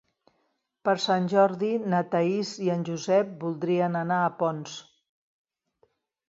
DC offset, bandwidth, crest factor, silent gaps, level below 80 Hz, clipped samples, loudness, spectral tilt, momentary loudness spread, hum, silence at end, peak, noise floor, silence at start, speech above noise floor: under 0.1%; 7.8 kHz; 18 dB; none; -76 dBFS; under 0.1%; -26 LUFS; -6 dB/octave; 9 LU; none; 1.45 s; -10 dBFS; -74 dBFS; 0.85 s; 49 dB